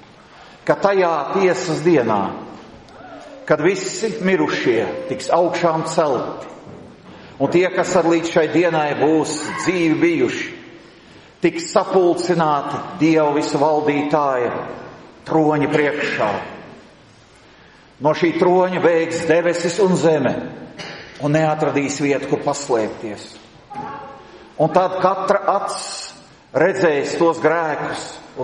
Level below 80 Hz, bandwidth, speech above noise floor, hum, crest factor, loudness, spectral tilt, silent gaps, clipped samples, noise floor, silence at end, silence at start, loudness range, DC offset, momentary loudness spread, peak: -58 dBFS; 11 kHz; 30 dB; none; 18 dB; -18 LUFS; -5.5 dB/octave; none; under 0.1%; -47 dBFS; 0 s; 0.4 s; 4 LU; under 0.1%; 17 LU; 0 dBFS